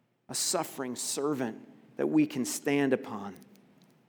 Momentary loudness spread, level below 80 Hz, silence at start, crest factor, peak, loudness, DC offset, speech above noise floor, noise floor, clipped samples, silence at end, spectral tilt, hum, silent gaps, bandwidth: 13 LU; -86 dBFS; 0.3 s; 18 dB; -14 dBFS; -31 LUFS; under 0.1%; 31 dB; -61 dBFS; under 0.1%; 0.65 s; -3.5 dB/octave; none; none; over 20 kHz